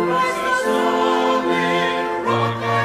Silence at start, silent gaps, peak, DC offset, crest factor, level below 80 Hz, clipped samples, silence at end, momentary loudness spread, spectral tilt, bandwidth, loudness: 0 s; none; -6 dBFS; under 0.1%; 12 dB; -56 dBFS; under 0.1%; 0 s; 3 LU; -5 dB/octave; 15.5 kHz; -19 LUFS